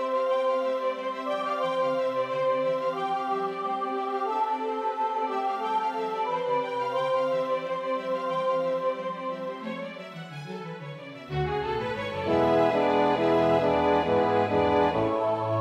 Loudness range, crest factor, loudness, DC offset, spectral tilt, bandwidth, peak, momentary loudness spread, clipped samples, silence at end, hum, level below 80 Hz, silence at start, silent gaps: 8 LU; 16 dB; -27 LUFS; under 0.1%; -6.5 dB/octave; 9.8 kHz; -10 dBFS; 11 LU; under 0.1%; 0 s; none; -56 dBFS; 0 s; none